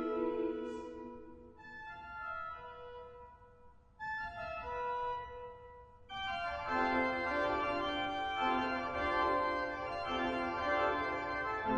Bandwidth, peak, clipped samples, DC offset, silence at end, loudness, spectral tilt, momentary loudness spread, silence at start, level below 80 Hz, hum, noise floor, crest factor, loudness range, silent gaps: 9 kHz; -20 dBFS; under 0.1%; under 0.1%; 0 s; -37 LUFS; -5.5 dB/octave; 18 LU; 0 s; -60 dBFS; none; -60 dBFS; 16 dB; 12 LU; none